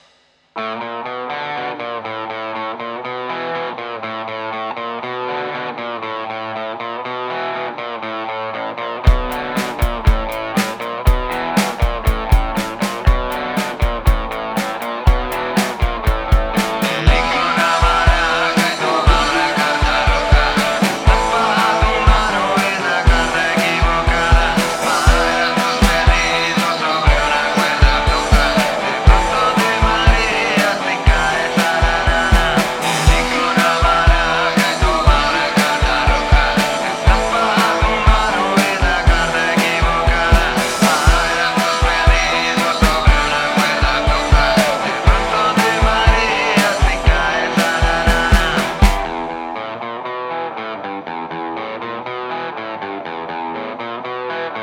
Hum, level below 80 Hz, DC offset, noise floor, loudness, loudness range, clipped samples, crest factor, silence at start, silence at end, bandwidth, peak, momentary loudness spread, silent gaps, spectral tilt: none; -20 dBFS; under 0.1%; -55 dBFS; -16 LUFS; 10 LU; under 0.1%; 16 dB; 0.55 s; 0 s; 19.5 kHz; 0 dBFS; 11 LU; none; -4.5 dB/octave